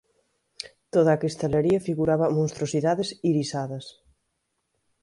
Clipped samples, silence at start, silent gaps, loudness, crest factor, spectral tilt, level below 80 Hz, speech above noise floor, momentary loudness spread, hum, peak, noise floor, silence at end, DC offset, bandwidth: under 0.1%; 0.6 s; none; -24 LUFS; 18 dB; -6.5 dB/octave; -56 dBFS; 53 dB; 17 LU; none; -8 dBFS; -77 dBFS; 1.1 s; under 0.1%; 11.5 kHz